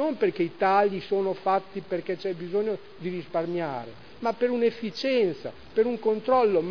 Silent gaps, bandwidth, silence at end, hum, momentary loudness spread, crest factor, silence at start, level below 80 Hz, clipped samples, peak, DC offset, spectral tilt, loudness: none; 5.4 kHz; 0 s; none; 11 LU; 18 dB; 0 s; -64 dBFS; under 0.1%; -8 dBFS; 0.4%; -7 dB/octave; -27 LUFS